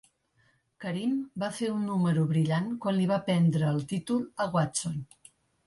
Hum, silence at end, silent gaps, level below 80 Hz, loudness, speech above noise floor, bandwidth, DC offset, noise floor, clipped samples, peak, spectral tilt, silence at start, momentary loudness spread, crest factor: none; 0.65 s; none; -66 dBFS; -29 LUFS; 41 dB; 11.5 kHz; under 0.1%; -69 dBFS; under 0.1%; -14 dBFS; -6.5 dB/octave; 0.8 s; 10 LU; 14 dB